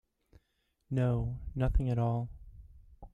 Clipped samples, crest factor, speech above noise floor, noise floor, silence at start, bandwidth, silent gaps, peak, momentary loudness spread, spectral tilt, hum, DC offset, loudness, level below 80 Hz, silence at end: under 0.1%; 18 dB; 47 dB; -78 dBFS; 0.9 s; 3.8 kHz; none; -16 dBFS; 9 LU; -10 dB/octave; none; under 0.1%; -33 LUFS; -40 dBFS; 0.05 s